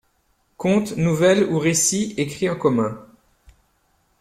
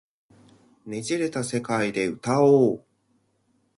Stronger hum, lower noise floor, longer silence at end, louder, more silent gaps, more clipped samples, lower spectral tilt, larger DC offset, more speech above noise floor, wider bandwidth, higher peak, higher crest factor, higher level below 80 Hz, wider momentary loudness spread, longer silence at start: neither; about the same, -65 dBFS vs -68 dBFS; first, 1.15 s vs 1 s; first, -20 LUFS vs -23 LUFS; neither; neither; about the same, -4.5 dB/octave vs -5.5 dB/octave; neither; about the same, 46 dB vs 46 dB; first, 15.5 kHz vs 11.5 kHz; about the same, -6 dBFS vs -6 dBFS; about the same, 16 dB vs 18 dB; first, -56 dBFS vs -66 dBFS; second, 9 LU vs 15 LU; second, 0.6 s vs 0.85 s